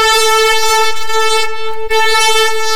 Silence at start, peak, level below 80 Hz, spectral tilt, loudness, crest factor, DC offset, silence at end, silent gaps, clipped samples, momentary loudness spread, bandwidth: 0 s; -4 dBFS; -36 dBFS; 1 dB/octave; -11 LUFS; 8 dB; under 0.1%; 0 s; none; under 0.1%; 7 LU; 16 kHz